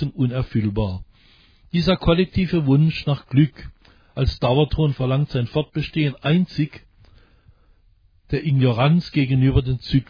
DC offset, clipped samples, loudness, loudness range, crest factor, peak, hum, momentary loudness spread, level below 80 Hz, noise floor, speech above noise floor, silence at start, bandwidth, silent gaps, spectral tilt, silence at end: under 0.1%; under 0.1%; -20 LUFS; 4 LU; 16 dB; -4 dBFS; none; 8 LU; -36 dBFS; -56 dBFS; 37 dB; 0 s; 5.2 kHz; none; -9 dB/octave; 0.05 s